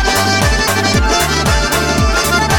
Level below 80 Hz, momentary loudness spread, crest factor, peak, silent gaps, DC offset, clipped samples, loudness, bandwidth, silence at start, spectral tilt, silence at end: -20 dBFS; 1 LU; 12 dB; 0 dBFS; none; under 0.1%; under 0.1%; -12 LUFS; over 20 kHz; 0 s; -3.5 dB/octave; 0 s